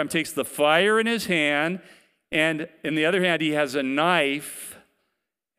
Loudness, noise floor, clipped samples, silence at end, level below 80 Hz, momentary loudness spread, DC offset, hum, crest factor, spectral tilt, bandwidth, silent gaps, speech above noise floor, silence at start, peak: -22 LUFS; -81 dBFS; under 0.1%; 0.8 s; -68 dBFS; 11 LU; under 0.1%; none; 20 dB; -4 dB/octave; 16 kHz; none; 58 dB; 0 s; -4 dBFS